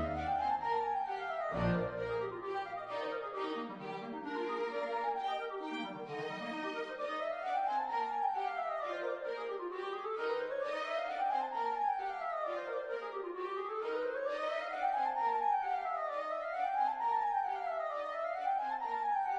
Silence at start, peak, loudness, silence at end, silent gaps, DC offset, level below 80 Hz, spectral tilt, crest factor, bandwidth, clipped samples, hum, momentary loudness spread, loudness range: 0 s; -22 dBFS; -37 LUFS; 0 s; none; under 0.1%; -62 dBFS; -6 dB/octave; 16 dB; 9.8 kHz; under 0.1%; none; 7 LU; 4 LU